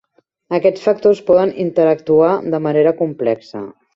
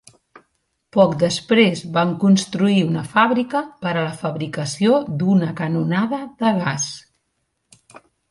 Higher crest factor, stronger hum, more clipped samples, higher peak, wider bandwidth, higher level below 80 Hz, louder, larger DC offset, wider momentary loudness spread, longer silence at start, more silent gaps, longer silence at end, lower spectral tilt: about the same, 14 dB vs 18 dB; neither; neither; about the same, -2 dBFS vs -2 dBFS; second, 7.4 kHz vs 11.5 kHz; about the same, -60 dBFS vs -60 dBFS; first, -15 LUFS vs -19 LUFS; neither; about the same, 8 LU vs 9 LU; second, 0.5 s vs 0.95 s; neither; about the same, 0.25 s vs 0.35 s; first, -8 dB/octave vs -5.5 dB/octave